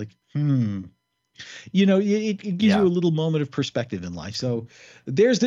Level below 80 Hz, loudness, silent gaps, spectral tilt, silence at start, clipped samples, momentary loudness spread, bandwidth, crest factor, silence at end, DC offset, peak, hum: -60 dBFS; -23 LUFS; none; -6.5 dB/octave; 0 s; under 0.1%; 14 LU; 7.6 kHz; 16 dB; 0 s; under 0.1%; -8 dBFS; none